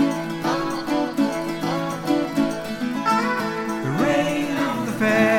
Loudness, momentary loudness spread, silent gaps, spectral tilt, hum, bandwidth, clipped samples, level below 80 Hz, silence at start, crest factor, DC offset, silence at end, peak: -23 LUFS; 5 LU; none; -5.5 dB/octave; none; 17 kHz; under 0.1%; -52 dBFS; 0 s; 16 dB; under 0.1%; 0 s; -6 dBFS